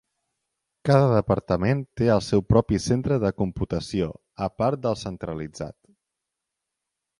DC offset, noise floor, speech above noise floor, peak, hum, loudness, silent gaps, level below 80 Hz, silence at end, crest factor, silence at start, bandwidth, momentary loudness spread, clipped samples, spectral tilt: under 0.1%; -84 dBFS; 61 dB; -6 dBFS; none; -24 LUFS; none; -44 dBFS; 1.5 s; 20 dB; 0.85 s; 11.5 kHz; 12 LU; under 0.1%; -7 dB/octave